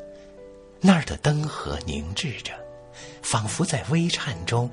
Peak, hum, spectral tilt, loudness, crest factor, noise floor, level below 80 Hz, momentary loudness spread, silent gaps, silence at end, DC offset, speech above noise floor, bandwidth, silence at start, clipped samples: -4 dBFS; none; -5 dB/octave; -25 LUFS; 22 dB; -46 dBFS; -44 dBFS; 22 LU; none; 0 s; under 0.1%; 21 dB; 11 kHz; 0 s; under 0.1%